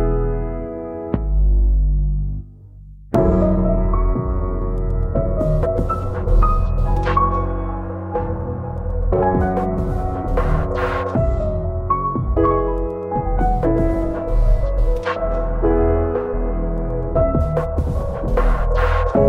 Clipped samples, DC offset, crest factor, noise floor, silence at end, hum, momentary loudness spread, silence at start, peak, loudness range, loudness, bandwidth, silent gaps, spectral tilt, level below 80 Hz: under 0.1%; under 0.1%; 14 dB; -39 dBFS; 0 s; none; 7 LU; 0 s; -4 dBFS; 1 LU; -20 LUFS; 4.6 kHz; none; -9.5 dB/octave; -20 dBFS